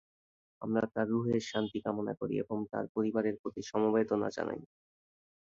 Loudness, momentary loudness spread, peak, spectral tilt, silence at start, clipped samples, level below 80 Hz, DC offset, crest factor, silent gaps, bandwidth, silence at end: -34 LUFS; 8 LU; -16 dBFS; -6.5 dB/octave; 0.6 s; under 0.1%; -70 dBFS; under 0.1%; 18 dB; 2.89-2.95 s, 3.39-3.44 s; 7.6 kHz; 0.85 s